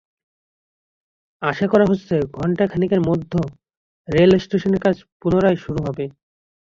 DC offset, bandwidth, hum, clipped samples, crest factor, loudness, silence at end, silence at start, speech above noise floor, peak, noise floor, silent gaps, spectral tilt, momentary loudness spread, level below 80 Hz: under 0.1%; 7.4 kHz; none; under 0.1%; 18 dB; -19 LUFS; 0.65 s; 1.4 s; over 72 dB; -2 dBFS; under -90 dBFS; 3.77-4.05 s, 5.12-5.20 s; -8 dB/octave; 10 LU; -48 dBFS